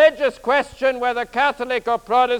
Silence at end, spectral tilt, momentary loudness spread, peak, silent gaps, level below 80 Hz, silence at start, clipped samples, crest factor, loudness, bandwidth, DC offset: 0 s; -3.5 dB/octave; 5 LU; -2 dBFS; none; -52 dBFS; 0 s; under 0.1%; 16 dB; -20 LUFS; 14 kHz; under 0.1%